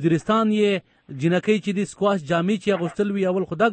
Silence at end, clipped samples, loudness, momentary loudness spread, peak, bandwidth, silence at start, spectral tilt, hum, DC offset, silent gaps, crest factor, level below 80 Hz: 0 s; under 0.1%; -22 LUFS; 6 LU; -8 dBFS; 8.8 kHz; 0 s; -6.5 dB/octave; none; under 0.1%; none; 14 dB; -60 dBFS